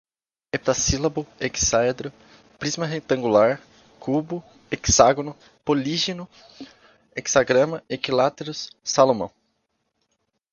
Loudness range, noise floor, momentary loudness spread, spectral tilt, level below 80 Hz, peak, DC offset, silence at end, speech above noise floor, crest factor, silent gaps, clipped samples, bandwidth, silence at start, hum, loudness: 2 LU; -74 dBFS; 15 LU; -3.5 dB/octave; -44 dBFS; 0 dBFS; under 0.1%; 1.25 s; 52 dB; 24 dB; none; under 0.1%; 10 kHz; 0.55 s; none; -22 LUFS